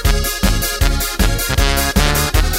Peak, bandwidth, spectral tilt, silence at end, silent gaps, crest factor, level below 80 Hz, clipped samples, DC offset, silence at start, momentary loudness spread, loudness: 0 dBFS; 16.5 kHz; -3.5 dB/octave; 0 s; none; 14 dB; -18 dBFS; under 0.1%; under 0.1%; 0 s; 2 LU; -16 LUFS